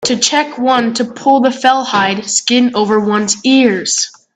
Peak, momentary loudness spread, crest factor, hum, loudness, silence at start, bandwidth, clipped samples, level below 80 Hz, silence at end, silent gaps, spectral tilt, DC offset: 0 dBFS; 4 LU; 12 dB; none; -12 LUFS; 0 s; 9.4 kHz; under 0.1%; -58 dBFS; 0.25 s; none; -2.5 dB/octave; under 0.1%